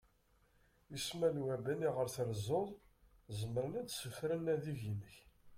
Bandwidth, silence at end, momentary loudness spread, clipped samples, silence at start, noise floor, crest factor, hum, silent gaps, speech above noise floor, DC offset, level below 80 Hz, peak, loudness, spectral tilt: 16.5 kHz; 0 s; 10 LU; under 0.1%; 0.9 s; -73 dBFS; 18 dB; none; none; 34 dB; under 0.1%; -68 dBFS; -24 dBFS; -40 LUFS; -5.5 dB/octave